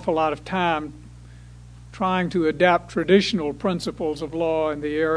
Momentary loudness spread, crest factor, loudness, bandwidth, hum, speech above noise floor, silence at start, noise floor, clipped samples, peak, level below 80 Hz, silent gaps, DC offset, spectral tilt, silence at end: 9 LU; 20 dB; -22 LUFS; 11 kHz; 60 Hz at -40 dBFS; 21 dB; 0 s; -43 dBFS; under 0.1%; -4 dBFS; -48 dBFS; none; under 0.1%; -6 dB/octave; 0 s